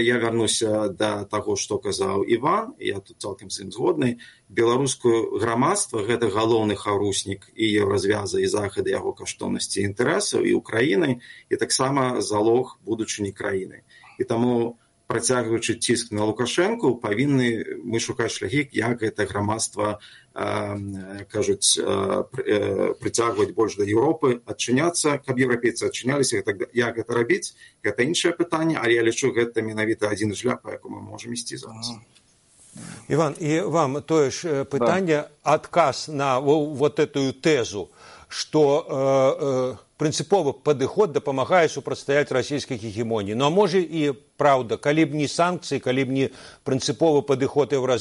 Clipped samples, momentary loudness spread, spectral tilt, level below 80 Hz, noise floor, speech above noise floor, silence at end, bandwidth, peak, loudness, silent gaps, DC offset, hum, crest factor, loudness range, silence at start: under 0.1%; 10 LU; -4.5 dB/octave; -62 dBFS; -57 dBFS; 34 dB; 0 s; 11.5 kHz; -4 dBFS; -23 LUFS; none; under 0.1%; none; 18 dB; 3 LU; 0 s